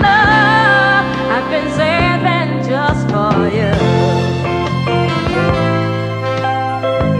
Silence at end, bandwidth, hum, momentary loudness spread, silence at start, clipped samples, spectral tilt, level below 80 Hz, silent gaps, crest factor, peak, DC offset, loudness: 0 s; 10 kHz; none; 8 LU; 0 s; under 0.1%; -6.5 dB/octave; -34 dBFS; none; 12 dB; 0 dBFS; under 0.1%; -14 LUFS